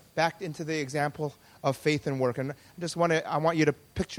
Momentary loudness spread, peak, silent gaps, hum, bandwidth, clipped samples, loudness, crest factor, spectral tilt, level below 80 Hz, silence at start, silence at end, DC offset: 11 LU; -10 dBFS; none; none; 18.5 kHz; under 0.1%; -29 LUFS; 18 dB; -5.5 dB/octave; -56 dBFS; 0.15 s; 0 s; under 0.1%